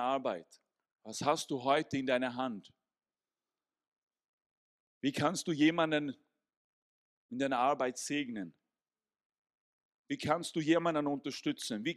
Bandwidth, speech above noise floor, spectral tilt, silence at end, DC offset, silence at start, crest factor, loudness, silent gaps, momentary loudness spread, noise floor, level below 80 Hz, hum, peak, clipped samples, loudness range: 13.5 kHz; over 56 dB; -4.5 dB/octave; 0 s; under 0.1%; 0 s; 22 dB; -34 LUFS; 3.88-3.92 s, 3.98-4.07 s, 4.29-4.38 s, 4.46-5.01 s, 6.57-7.29 s, 9.25-9.30 s, 9.38-9.45 s, 9.57-10.04 s; 13 LU; under -90 dBFS; -76 dBFS; none; -14 dBFS; under 0.1%; 4 LU